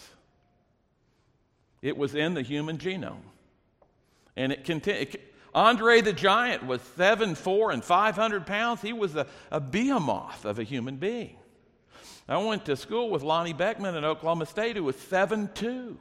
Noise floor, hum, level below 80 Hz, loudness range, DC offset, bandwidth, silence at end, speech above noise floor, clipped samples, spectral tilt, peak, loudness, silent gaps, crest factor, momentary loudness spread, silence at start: -69 dBFS; none; -62 dBFS; 10 LU; under 0.1%; 14.5 kHz; 0.05 s; 42 dB; under 0.1%; -5 dB/octave; -6 dBFS; -27 LUFS; none; 22 dB; 11 LU; 0 s